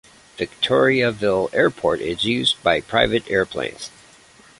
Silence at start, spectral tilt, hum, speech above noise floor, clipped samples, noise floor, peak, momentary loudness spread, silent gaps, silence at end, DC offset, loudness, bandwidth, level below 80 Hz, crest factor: 0.4 s; -4.5 dB/octave; none; 30 dB; under 0.1%; -49 dBFS; -2 dBFS; 12 LU; none; 0.7 s; under 0.1%; -20 LUFS; 11.5 kHz; -48 dBFS; 20 dB